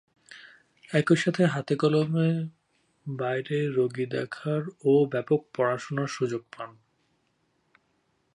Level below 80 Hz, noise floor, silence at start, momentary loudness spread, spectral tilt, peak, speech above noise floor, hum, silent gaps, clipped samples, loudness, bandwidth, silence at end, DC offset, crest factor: -74 dBFS; -72 dBFS; 0.3 s; 18 LU; -7 dB/octave; -8 dBFS; 46 dB; none; none; under 0.1%; -27 LUFS; 11 kHz; 1.65 s; under 0.1%; 20 dB